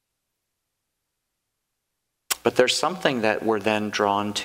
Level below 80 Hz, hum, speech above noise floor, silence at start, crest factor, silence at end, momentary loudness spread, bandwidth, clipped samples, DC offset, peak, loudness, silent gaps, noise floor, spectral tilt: -66 dBFS; none; 57 dB; 2.3 s; 26 dB; 0 s; 4 LU; 16 kHz; under 0.1%; under 0.1%; 0 dBFS; -23 LUFS; none; -80 dBFS; -3 dB/octave